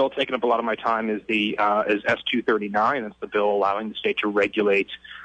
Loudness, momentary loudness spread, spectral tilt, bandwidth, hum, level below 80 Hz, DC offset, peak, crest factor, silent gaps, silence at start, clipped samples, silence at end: -23 LUFS; 4 LU; -5.5 dB/octave; 8.4 kHz; none; -62 dBFS; under 0.1%; -10 dBFS; 14 dB; none; 0 s; under 0.1%; 0 s